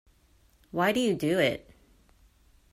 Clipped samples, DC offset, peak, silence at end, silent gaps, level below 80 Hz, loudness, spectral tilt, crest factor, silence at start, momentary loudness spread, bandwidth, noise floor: under 0.1%; under 0.1%; -12 dBFS; 1.15 s; none; -60 dBFS; -27 LUFS; -5 dB/octave; 20 dB; 0.75 s; 11 LU; 16 kHz; -63 dBFS